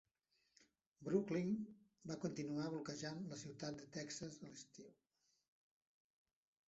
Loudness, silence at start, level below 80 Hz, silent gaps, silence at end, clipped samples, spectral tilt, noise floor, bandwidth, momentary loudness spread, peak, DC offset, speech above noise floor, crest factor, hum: -46 LUFS; 0.6 s; -82 dBFS; 0.87-0.92 s; 1.75 s; under 0.1%; -6 dB/octave; -85 dBFS; 8 kHz; 16 LU; -26 dBFS; under 0.1%; 39 dB; 22 dB; none